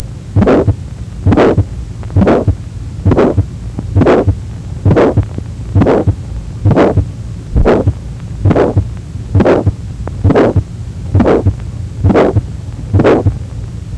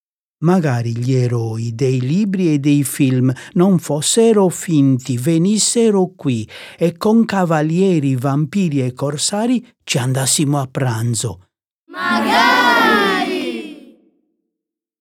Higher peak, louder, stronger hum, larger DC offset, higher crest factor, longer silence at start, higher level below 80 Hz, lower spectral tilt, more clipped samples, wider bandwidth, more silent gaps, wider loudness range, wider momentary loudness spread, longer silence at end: about the same, 0 dBFS vs -2 dBFS; first, -12 LUFS vs -16 LUFS; neither; neither; about the same, 12 dB vs 16 dB; second, 0 s vs 0.4 s; first, -22 dBFS vs -60 dBFS; first, -9 dB/octave vs -5 dB/octave; neither; second, 9 kHz vs 17.5 kHz; second, none vs 11.67-11.87 s; about the same, 1 LU vs 3 LU; first, 14 LU vs 9 LU; second, 0 s vs 1.25 s